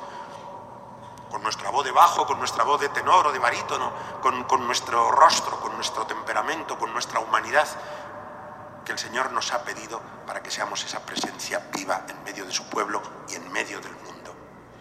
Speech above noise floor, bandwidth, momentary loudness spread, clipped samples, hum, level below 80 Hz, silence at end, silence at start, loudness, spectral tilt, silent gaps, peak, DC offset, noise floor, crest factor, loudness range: 20 dB; 16 kHz; 21 LU; under 0.1%; none; -64 dBFS; 0 s; 0 s; -24 LUFS; -1.5 dB/octave; none; -2 dBFS; under 0.1%; -45 dBFS; 24 dB; 8 LU